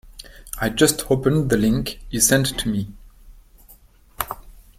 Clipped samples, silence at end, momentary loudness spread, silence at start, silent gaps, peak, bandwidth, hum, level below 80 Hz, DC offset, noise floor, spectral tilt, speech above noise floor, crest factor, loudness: under 0.1%; 0.2 s; 19 LU; 0.05 s; none; 0 dBFS; 16.5 kHz; none; -40 dBFS; under 0.1%; -50 dBFS; -4 dB/octave; 31 dB; 22 dB; -20 LUFS